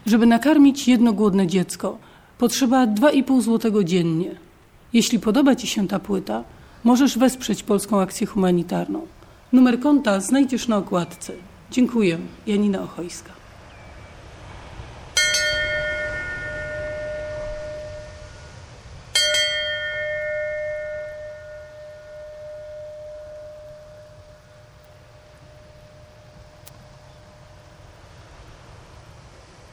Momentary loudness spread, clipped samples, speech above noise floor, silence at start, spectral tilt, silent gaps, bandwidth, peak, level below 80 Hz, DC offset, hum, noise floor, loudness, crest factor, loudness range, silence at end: 23 LU; under 0.1%; 29 dB; 0.05 s; -4.5 dB/octave; none; 17 kHz; -6 dBFS; -48 dBFS; under 0.1%; none; -48 dBFS; -20 LUFS; 18 dB; 16 LU; 0.45 s